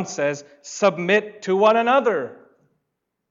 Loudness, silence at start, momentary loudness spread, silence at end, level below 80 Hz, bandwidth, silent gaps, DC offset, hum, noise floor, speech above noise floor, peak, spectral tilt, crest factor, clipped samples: -20 LUFS; 0 s; 16 LU; 0.95 s; -74 dBFS; 7.8 kHz; none; under 0.1%; none; -78 dBFS; 58 dB; -6 dBFS; -4.5 dB/octave; 16 dB; under 0.1%